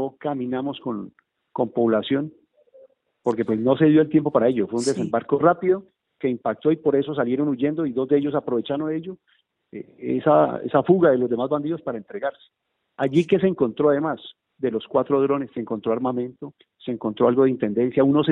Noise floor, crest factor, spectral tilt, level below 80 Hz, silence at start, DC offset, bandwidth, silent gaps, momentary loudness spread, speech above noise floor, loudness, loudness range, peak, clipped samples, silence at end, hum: -54 dBFS; 18 dB; -7.5 dB/octave; -64 dBFS; 0 s; under 0.1%; 10.5 kHz; none; 13 LU; 32 dB; -22 LUFS; 4 LU; -4 dBFS; under 0.1%; 0 s; none